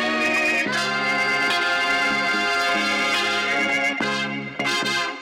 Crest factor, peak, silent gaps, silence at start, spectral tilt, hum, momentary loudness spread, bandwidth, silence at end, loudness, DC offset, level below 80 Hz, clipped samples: 8 dB; -14 dBFS; none; 0 s; -2.5 dB/octave; none; 4 LU; 19.5 kHz; 0 s; -20 LUFS; under 0.1%; -60 dBFS; under 0.1%